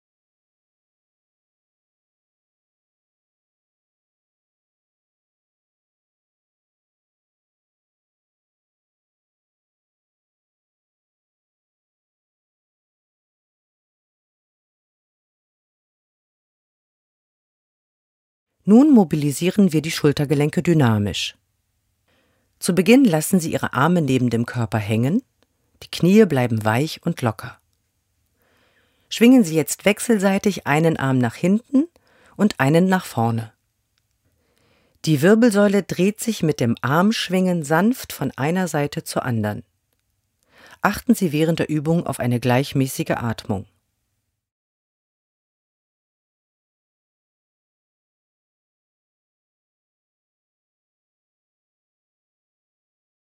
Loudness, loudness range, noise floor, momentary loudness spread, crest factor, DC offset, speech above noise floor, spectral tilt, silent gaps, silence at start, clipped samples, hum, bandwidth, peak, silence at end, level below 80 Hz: -19 LUFS; 6 LU; -75 dBFS; 11 LU; 22 dB; under 0.1%; 57 dB; -6 dB/octave; none; 18.65 s; under 0.1%; none; 16 kHz; 0 dBFS; 9.7 s; -58 dBFS